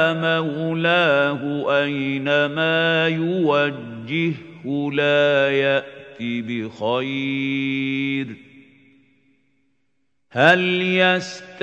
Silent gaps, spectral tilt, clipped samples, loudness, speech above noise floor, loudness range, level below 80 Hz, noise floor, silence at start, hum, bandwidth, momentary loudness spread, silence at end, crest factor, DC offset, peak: none; -6 dB/octave; under 0.1%; -20 LUFS; 54 dB; 6 LU; -70 dBFS; -74 dBFS; 0 s; none; 8.6 kHz; 11 LU; 0 s; 20 dB; under 0.1%; 0 dBFS